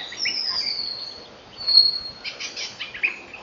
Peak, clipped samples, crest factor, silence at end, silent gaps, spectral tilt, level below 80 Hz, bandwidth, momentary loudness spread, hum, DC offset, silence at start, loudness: -4 dBFS; under 0.1%; 22 dB; 0 s; none; 0.5 dB/octave; -62 dBFS; 7.6 kHz; 17 LU; none; under 0.1%; 0 s; -21 LUFS